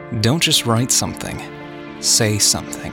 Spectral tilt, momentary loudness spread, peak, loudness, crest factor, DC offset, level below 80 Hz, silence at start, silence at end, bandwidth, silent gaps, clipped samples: -3 dB/octave; 17 LU; -4 dBFS; -16 LUFS; 16 dB; under 0.1%; -46 dBFS; 0 s; 0 s; 17.5 kHz; none; under 0.1%